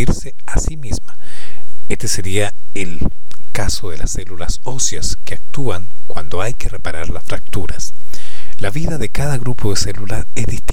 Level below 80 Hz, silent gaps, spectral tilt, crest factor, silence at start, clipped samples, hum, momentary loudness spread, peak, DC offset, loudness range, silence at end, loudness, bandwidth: -26 dBFS; none; -4 dB/octave; 16 dB; 0 s; under 0.1%; none; 13 LU; 0 dBFS; 50%; 3 LU; 0 s; -23 LUFS; 16.5 kHz